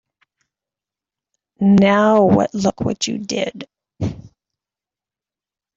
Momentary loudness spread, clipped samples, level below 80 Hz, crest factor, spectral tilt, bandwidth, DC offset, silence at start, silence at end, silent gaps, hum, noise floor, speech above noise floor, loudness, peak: 14 LU; under 0.1%; -52 dBFS; 18 dB; -6 dB/octave; 7.8 kHz; under 0.1%; 1.6 s; 1.5 s; none; none; -90 dBFS; 74 dB; -17 LUFS; -2 dBFS